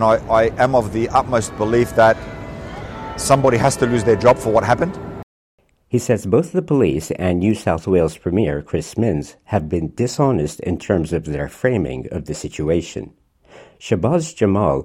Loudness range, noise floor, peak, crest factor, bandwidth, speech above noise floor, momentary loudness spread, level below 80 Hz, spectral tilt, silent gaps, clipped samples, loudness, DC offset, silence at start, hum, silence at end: 5 LU; -46 dBFS; -2 dBFS; 16 dB; 16 kHz; 28 dB; 14 LU; -40 dBFS; -6 dB/octave; 5.23-5.58 s; under 0.1%; -18 LUFS; under 0.1%; 0 s; none; 0 s